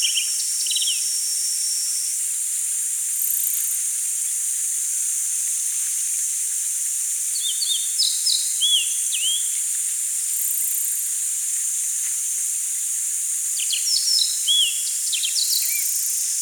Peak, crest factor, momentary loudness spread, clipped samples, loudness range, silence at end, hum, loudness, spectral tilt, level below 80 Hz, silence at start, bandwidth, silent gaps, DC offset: -6 dBFS; 16 dB; 4 LU; under 0.1%; 2 LU; 0 s; none; -19 LUFS; 13.5 dB/octave; under -90 dBFS; 0 s; over 20 kHz; none; under 0.1%